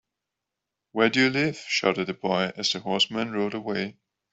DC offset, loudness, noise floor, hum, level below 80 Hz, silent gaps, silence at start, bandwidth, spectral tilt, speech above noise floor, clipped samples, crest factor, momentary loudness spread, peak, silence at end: under 0.1%; -25 LUFS; -85 dBFS; none; -66 dBFS; none; 0.95 s; 8.2 kHz; -4 dB/octave; 60 dB; under 0.1%; 22 dB; 9 LU; -6 dBFS; 0.4 s